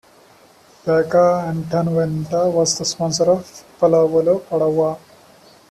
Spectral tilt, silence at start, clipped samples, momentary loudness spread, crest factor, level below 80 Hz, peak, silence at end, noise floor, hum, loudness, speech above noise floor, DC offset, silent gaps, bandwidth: -5 dB/octave; 0.85 s; under 0.1%; 7 LU; 14 dB; -56 dBFS; -4 dBFS; 0.75 s; -49 dBFS; none; -18 LUFS; 32 dB; under 0.1%; none; 13.5 kHz